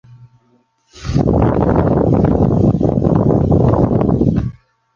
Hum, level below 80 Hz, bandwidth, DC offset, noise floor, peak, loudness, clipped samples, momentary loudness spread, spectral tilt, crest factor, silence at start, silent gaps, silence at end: none; -26 dBFS; 7.2 kHz; under 0.1%; -57 dBFS; -2 dBFS; -14 LUFS; under 0.1%; 5 LU; -10 dB/octave; 12 dB; 0.2 s; none; 0.45 s